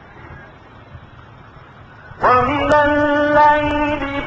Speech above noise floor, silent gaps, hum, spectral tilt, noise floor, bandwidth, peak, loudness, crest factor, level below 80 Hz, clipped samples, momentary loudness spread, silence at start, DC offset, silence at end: 27 dB; none; none; -6.5 dB/octave; -41 dBFS; 8.2 kHz; -2 dBFS; -15 LUFS; 16 dB; -38 dBFS; under 0.1%; 7 LU; 0.2 s; under 0.1%; 0 s